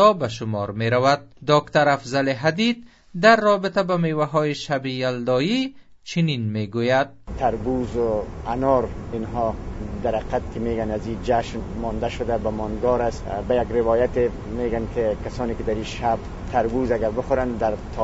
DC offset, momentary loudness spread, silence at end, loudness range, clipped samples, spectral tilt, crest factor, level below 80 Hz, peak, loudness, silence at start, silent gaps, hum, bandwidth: under 0.1%; 9 LU; 0 s; 5 LU; under 0.1%; -6 dB/octave; 20 dB; -38 dBFS; -2 dBFS; -23 LUFS; 0 s; none; none; 8 kHz